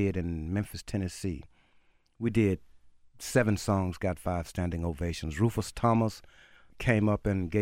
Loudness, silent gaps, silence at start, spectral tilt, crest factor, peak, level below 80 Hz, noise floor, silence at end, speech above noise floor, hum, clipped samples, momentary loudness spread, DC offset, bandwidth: -30 LUFS; none; 0 s; -6.5 dB/octave; 20 dB; -10 dBFS; -46 dBFS; -64 dBFS; 0 s; 35 dB; none; under 0.1%; 9 LU; under 0.1%; 16 kHz